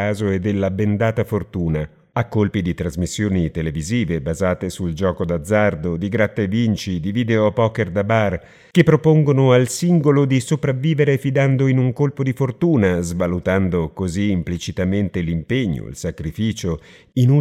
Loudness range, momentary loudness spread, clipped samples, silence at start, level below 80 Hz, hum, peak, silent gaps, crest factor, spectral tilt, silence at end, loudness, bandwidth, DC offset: 5 LU; 9 LU; under 0.1%; 0 s; -44 dBFS; none; 0 dBFS; none; 18 dB; -7 dB/octave; 0 s; -19 LUFS; 14.5 kHz; under 0.1%